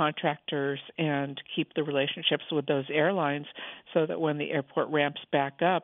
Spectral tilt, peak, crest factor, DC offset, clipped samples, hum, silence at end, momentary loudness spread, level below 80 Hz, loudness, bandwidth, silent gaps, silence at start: -9 dB/octave; -10 dBFS; 18 dB; under 0.1%; under 0.1%; none; 0 s; 6 LU; -80 dBFS; -29 LUFS; 4 kHz; none; 0 s